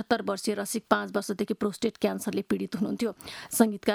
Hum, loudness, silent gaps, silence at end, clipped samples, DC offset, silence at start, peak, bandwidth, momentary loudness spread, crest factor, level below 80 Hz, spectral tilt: none; -29 LUFS; none; 0 s; under 0.1%; under 0.1%; 0 s; -4 dBFS; over 20 kHz; 7 LU; 24 dB; -64 dBFS; -4.5 dB/octave